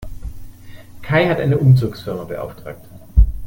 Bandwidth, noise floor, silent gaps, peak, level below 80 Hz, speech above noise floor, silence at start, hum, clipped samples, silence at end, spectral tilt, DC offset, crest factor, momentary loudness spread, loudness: 16.5 kHz; -36 dBFS; none; 0 dBFS; -24 dBFS; 19 dB; 0 s; none; under 0.1%; 0 s; -8.5 dB/octave; under 0.1%; 16 dB; 22 LU; -17 LUFS